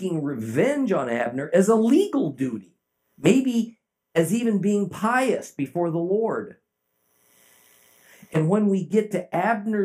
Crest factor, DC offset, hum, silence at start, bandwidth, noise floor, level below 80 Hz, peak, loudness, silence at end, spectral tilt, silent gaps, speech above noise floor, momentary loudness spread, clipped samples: 18 dB; under 0.1%; none; 0 s; 15.5 kHz; -72 dBFS; -72 dBFS; -4 dBFS; -23 LUFS; 0 s; -6.5 dB/octave; none; 50 dB; 9 LU; under 0.1%